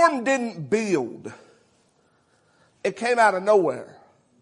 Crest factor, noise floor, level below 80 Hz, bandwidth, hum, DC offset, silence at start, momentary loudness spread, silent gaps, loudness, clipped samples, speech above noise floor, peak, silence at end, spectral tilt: 20 dB; -64 dBFS; -74 dBFS; 11 kHz; none; under 0.1%; 0 s; 16 LU; none; -22 LUFS; under 0.1%; 41 dB; -4 dBFS; 0.55 s; -4.5 dB/octave